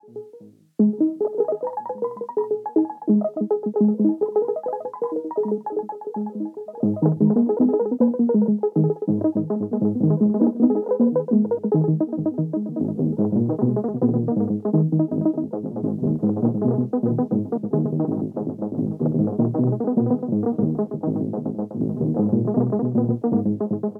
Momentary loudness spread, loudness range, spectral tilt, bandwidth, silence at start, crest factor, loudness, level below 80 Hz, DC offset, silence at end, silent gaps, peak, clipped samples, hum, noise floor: 8 LU; 3 LU; -13.5 dB/octave; 2 kHz; 0.1 s; 16 dB; -22 LUFS; -66 dBFS; under 0.1%; 0 s; none; -6 dBFS; under 0.1%; none; -47 dBFS